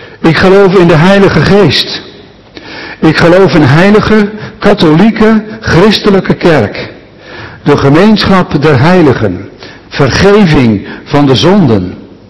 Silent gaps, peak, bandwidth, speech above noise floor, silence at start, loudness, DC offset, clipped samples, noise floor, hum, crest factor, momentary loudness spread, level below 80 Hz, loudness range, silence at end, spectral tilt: none; 0 dBFS; 12 kHz; 27 dB; 0 s; -6 LUFS; 3%; 10%; -32 dBFS; none; 6 dB; 15 LU; -30 dBFS; 2 LU; 0 s; -6.5 dB/octave